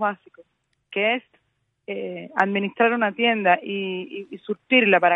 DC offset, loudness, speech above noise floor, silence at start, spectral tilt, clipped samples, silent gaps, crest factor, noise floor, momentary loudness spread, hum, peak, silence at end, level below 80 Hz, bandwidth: under 0.1%; -22 LUFS; 49 dB; 0 s; -7 dB/octave; under 0.1%; none; 20 dB; -72 dBFS; 15 LU; none; -4 dBFS; 0 s; -78 dBFS; 4.5 kHz